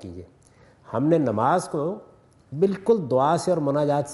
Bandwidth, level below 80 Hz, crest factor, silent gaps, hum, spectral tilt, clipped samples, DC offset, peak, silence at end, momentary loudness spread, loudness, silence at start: 11.5 kHz; -64 dBFS; 16 dB; none; none; -7 dB/octave; under 0.1%; under 0.1%; -8 dBFS; 0 s; 17 LU; -23 LUFS; 0 s